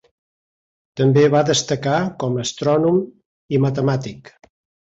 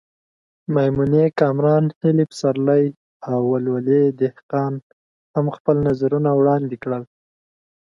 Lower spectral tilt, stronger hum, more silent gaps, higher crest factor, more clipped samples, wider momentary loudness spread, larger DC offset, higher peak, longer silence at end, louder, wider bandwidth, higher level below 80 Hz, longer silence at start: second, -5.5 dB/octave vs -9 dB/octave; neither; second, 3.26-3.48 s vs 1.96-2.01 s, 2.97-3.20 s, 4.43-4.49 s, 4.83-5.34 s, 5.60-5.65 s; about the same, 16 dB vs 16 dB; neither; about the same, 10 LU vs 10 LU; neither; about the same, -4 dBFS vs -4 dBFS; about the same, 0.7 s vs 0.8 s; about the same, -18 LUFS vs -19 LUFS; second, 8 kHz vs 11 kHz; about the same, -56 dBFS vs -54 dBFS; first, 0.95 s vs 0.7 s